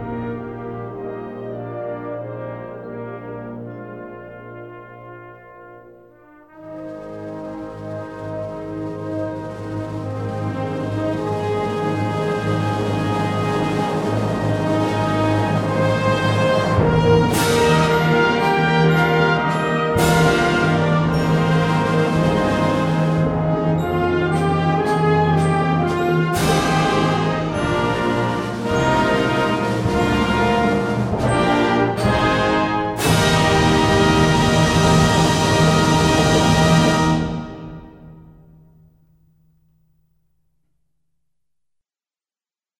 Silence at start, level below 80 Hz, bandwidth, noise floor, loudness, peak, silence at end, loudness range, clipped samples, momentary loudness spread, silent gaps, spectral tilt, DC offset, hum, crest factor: 0 s; -38 dBFS; 16 kHz; under -90 dBFS; -18 LUFS; -2 dBFS; 4.6 s; 17 LU; under 0.1%; 16 LU; none; -5.5 dB/octave; under 0.1%; none; 16 dB